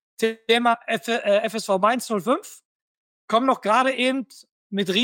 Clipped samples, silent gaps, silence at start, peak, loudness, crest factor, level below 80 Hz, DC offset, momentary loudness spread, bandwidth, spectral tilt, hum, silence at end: under 0.1%; 2.65-3.28 s, 4.51-4.70 s; 0.2 s; -4 dBFS; -22 LUFS; 18 dB; -78 dBFS; under 0.1%; 8 LU; 17 kHz; -4 dB/octave; none; 0 s